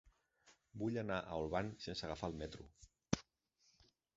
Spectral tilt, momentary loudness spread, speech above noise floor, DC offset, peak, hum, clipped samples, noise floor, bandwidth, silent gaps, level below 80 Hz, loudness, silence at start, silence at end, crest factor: -5 dB/octave; 12 LU; 35 dB; under 0.1%; -18 dBFS; none; under 0.1%; -79 dBFS; 7.6 kHz; none; -62 dBFS; -44 LUFS; 0.05 s; 0.95 s; 26 dB